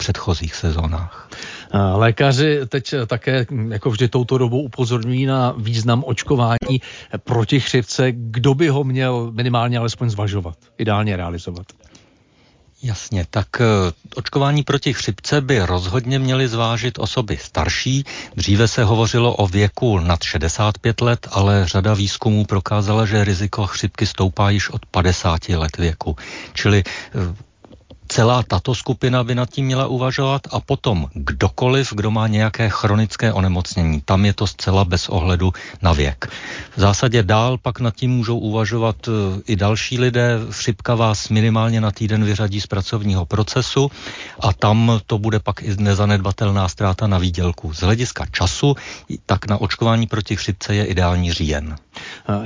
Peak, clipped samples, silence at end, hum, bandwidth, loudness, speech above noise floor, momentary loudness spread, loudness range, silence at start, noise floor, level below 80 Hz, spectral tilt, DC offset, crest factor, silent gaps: -4 dBFS; under 0.1%; 0 s; none; 7.6 kHz; -18 LUFS; 36 dB; 7 LU; 3 LU; 0 s; -54 dBFS; -32 dBFS; -6 dB/octave; under 0.1%; 14 dB; none